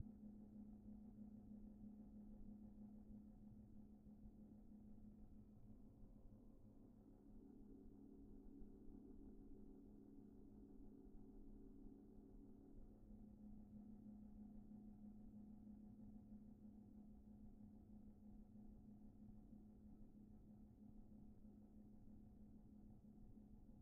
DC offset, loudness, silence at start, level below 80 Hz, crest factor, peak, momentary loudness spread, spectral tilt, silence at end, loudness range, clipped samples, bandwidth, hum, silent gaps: under 0.1%; -64 LUFS; 0 s; -68 dBFS; 22 dB; -40 dBFS; 5 LU; -9 dB/octave; 0 s; 4 LU; under 0.1%; 1.8 kHz; none; none